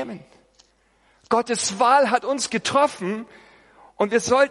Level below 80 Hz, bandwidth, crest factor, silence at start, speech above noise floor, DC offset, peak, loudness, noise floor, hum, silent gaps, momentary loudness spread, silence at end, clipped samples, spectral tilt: -64 dBFS; 11.5 kHz; 18 dB; 0 s; 40 dB; under 0.1%; -4 dBFS; -21 LUFS; -61 dBFS; none; none; 15 LU; 0 s; under 0.1%; -3 dB/octave